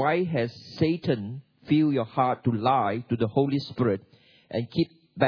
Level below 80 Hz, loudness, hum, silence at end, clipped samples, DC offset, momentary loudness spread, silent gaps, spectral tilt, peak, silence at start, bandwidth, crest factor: -64 dBFS; -26 LUFS; none; 0 s; under 0.1%; under 0.1%; 9 LU; none; -9 dB/octave; -8 dBFS; 0 s; 5.4 kHz; 18 dB